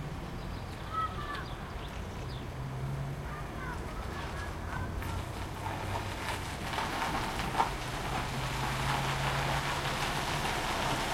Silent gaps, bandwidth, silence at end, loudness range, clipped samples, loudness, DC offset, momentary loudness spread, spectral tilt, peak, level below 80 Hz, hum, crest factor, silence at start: none; 16.5 kHz; 0 s; 6 LU; under 0.1%; -35 LUFS; under 0.1%; 9 LU; -4.5 dB/octave; -14 dBFS; -44 dBFS; none; 22 dB; 0 s